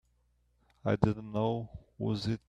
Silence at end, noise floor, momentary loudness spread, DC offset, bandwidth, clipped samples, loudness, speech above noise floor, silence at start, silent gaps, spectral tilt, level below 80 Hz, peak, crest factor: 0.1 s; -72 dBFS; 9 LU; under 0.1%; 9.2 kHz; under 0.1%; -33 LUFS; 40 dB; 0.85 s; none; -8 dB/octave; -56 dBFS; -8 dBFS; 26 dB